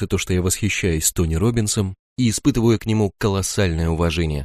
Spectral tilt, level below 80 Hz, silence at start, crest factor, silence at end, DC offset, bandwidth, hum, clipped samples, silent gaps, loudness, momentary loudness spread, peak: -5 dB/octave; -32 dBFS; 0 s; 16 dB; 0 s; under 0.1%; 15.5 kHz; none; under 0.1%; 1.99-2.16 s; -20 LUFS; 3 LU; -4 dBFS